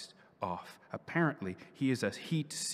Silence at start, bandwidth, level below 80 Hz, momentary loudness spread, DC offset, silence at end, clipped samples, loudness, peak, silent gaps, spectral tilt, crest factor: 0 s; 15.5 kHz; -80 dBFS; 13 LU; under 0.1%; 0 s; under 0.1%; -36 LUFS; -18 dBFS; none; -4.5 dB/octave; 18 dB